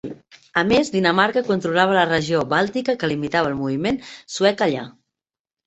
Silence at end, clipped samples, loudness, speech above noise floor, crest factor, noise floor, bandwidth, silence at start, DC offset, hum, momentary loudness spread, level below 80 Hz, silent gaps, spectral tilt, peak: 0.75 s; under 0.1%; -20 LUFS; 70 dB; 18 dB; -89 dBFS; 8.2 kHz; 0.05 s; under 0.1%; none; 9 LU; -54 dBFS; none; -5 dB/octave; -2 dBFS